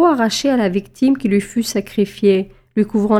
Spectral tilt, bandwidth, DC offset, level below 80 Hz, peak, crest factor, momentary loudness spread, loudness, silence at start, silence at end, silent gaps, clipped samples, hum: -5.5 dB/octave; 15 kHz; under 0.1%; -48 dBFS; -2 dBFS; 14 dB; 5 LU; -17 LUFS; 0 s; 0 s; none; under 0.1%; none